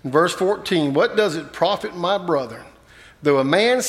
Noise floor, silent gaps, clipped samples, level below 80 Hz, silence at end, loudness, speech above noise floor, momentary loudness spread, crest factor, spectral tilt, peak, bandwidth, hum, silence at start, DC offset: -48 dBFS; none; under 0.1%; -58 dBFS; 0 s; -20 LUFS; 28 dB; 7 LU; 18 dB; -4.5 dB/octave; -2 dBFS; 15 kHz; none; 0.05 s; under 0.1%